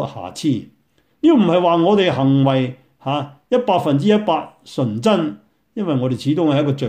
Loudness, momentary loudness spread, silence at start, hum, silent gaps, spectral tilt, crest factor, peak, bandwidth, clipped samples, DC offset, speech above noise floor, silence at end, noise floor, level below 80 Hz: -18 LUFS; 12 LU; 0 s; none; none; -7.5 dB/octave; 14 dB; -2 dBFS; 12.5 kHz; under 0.1%; under 0.1%; 25 dB; 0 s; -41 dBFS; -60 dBFS